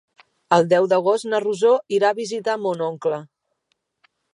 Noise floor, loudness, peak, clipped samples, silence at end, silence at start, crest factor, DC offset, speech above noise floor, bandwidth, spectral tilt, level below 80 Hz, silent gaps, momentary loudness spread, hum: -73 dBFS; -20 LUFS; -2 dBFS; under 0.1%; 1.1 s; 0.5 s; 20 dB; under 0.1%; 54 dB; 11.5 kHz; -5 dB/octave; -74 dBFS; none; 8 LU; none